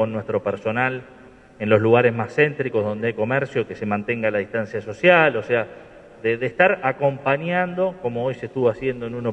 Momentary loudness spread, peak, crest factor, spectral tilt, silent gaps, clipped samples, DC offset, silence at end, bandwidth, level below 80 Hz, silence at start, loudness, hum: 10 LU; -2 dBFS; 20 dB; -7.5 dB/octave; none; under 0.1%; under 0.1%; 0 s; 8.4 kHz; -58 dBFS; 0 s; -21 LUFS; none